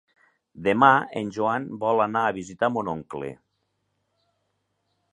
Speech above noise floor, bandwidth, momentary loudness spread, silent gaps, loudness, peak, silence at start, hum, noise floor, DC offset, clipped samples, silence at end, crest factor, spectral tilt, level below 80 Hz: 52 dB; 11 kHz; 15 LU; none; -23 LUFS; -2 dBFS; 0.55 s; none; -75 dBFS; under 0.1%; under 0.1%; 1.8 s; 24 dB; -6 dB/octave; -64 dBFS